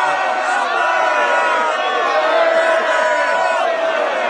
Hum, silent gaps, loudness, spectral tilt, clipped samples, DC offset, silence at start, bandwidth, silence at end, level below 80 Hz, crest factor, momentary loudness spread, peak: none; none; -15 LUFS; -1 dB/octave; under 0.1%; under 0.1%; 0 s; 11 kHz; 0 s; -66 dBFS; 14 dB; 3 LU; -2 dBFS